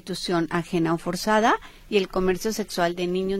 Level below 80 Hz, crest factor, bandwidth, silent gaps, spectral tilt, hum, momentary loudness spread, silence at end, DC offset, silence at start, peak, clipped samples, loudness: -46 dBFS; 16 dB; 16 kHz; none; -5 dB/octave; none; 6 LU; 0 s; under 0.1%; 0.05 s; -8 dBFS; under 0.1%; -24 LUFS